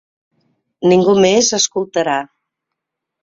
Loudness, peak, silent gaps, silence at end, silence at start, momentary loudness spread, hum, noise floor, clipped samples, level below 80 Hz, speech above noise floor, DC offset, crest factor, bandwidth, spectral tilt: -14 LUFS; -2 dBFS; none; 1 s; 0.8 s; 9 LU; none; -79 dBFS; under 0.1%; -56 dBFS; 66 dB; under 0.1%; 16 dB; 7.8 kHz; -3.5 dB/octave